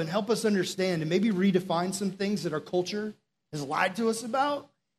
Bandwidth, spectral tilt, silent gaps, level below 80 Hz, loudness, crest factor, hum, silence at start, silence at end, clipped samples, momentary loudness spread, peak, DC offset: 13.5 kHz; -5 dB/octave; none; -74 dBFS; -28 LUFS; 18 dB; none; 0 s; 0.35 s; under 0.1%; 9 LU; -10 dBFS; under 0.1%